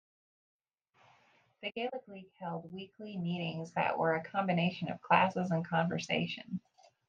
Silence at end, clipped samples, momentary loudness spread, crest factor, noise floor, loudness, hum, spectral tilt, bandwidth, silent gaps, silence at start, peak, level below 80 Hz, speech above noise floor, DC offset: 0.5 s; under 0.1%; 15 LU; 24 dB; -71 dBFS; -34 LUFS; none; -6.5 dB/octave; 7.4 kHz; none; 1.6 s; -12 dBFS; -78 dBFS; 36 dB; under 0.1%